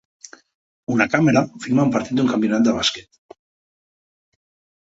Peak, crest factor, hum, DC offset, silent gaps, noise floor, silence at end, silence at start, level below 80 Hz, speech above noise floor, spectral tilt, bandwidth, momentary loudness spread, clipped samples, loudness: -2 dBFS; 20 dB; none; under 0.1%; none; under -90 dBFS; 1.85 s; 0.9 s; -56 dBFS; over 72 dB; -5 dB/octave; 8 kHz; 7 LU; under 0.1%; -19 LUFS